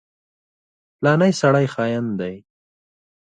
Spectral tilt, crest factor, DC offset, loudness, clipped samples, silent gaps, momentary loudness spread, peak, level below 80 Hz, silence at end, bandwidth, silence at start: -6.5 dB/octave; 18 dB; under 0.1%; -19 LUFS; under 0.1%; none; 11 LU; -4 dBFS; -62 dBFS; 0.95 s; 9.4 kHz; 1 s